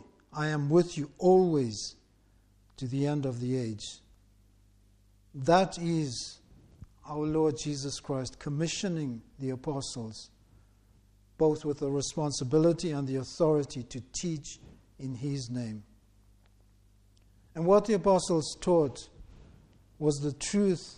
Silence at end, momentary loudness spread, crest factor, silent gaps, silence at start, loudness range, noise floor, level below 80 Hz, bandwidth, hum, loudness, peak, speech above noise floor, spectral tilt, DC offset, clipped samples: 0 s; 16 LU; 20 dB; none; 0.3 s; 7 LU; -64 dBFS; -58 dBFS; 11 kHz; 50 Hz at -65 dBFS; -30 LUFS; -10 dBFS; 35 dB; -6 dB/octave; under 0.1%; under 0.1%